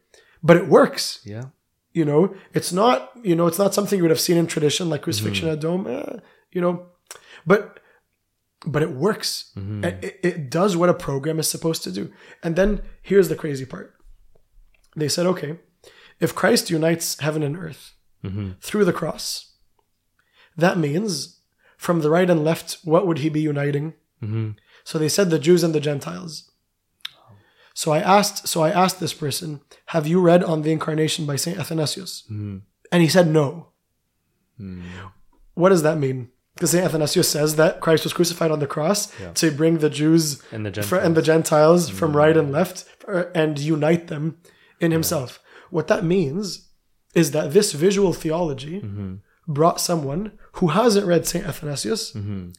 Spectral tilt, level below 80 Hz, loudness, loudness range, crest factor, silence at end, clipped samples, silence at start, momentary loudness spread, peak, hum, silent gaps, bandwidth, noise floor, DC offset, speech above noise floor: -5 dB/octave; -48 dBFS; -21 LUFS; 6 LU; 20 dB; 0.05 s; under 0.1%; 0.45 s; 17 LU; 0 dBFS; none; none; 16.5 kHz; -73 dBFS; under 0.1%; 53 dB